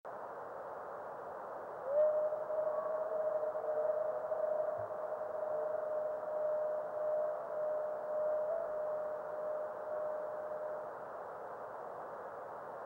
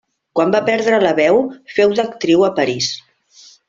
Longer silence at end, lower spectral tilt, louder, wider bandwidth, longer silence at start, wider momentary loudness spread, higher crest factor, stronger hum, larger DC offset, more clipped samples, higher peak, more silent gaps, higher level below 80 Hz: second, 0 s vs 0.7 s; first, -6.5 dB/octave vs -4.5 dB/octave; second, -39 LUFS vs -15 LUFS; second, 3.8 kHz vs 7.6 kHz; second, 0.05 s vs 0.35 s; about the same, 10 LU vs 8 LU; about the same, 16 dB vs 16 dB; neither; neither; neither; second, -24 dBFS vs 0 dBFS; neither; second, -82 dBFS vs -58 dBFS